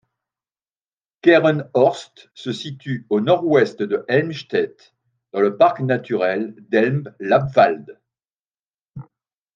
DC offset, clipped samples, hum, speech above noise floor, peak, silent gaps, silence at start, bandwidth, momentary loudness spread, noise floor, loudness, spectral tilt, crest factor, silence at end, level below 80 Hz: under 0.1%; under 0.1%; none; over 72 dB; -2 dBFS; 8.40-8.74 s; 1.25 s; 9 kHz; 13 LU; under -90 dBFS; -19 LUFS; -7 dB/octave; 18 dB; 0.55 s; -64 dBFS